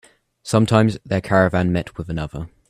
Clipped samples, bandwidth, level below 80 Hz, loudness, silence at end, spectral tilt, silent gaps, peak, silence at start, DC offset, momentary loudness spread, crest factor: under 0.1%; 13 kHz; -44 dBFS; -19 LUFS; 0.2 s; -6.5 dB/octave; none; 0 dBFS; 0.45 s; under 0.1%; 12 LU; 20 dB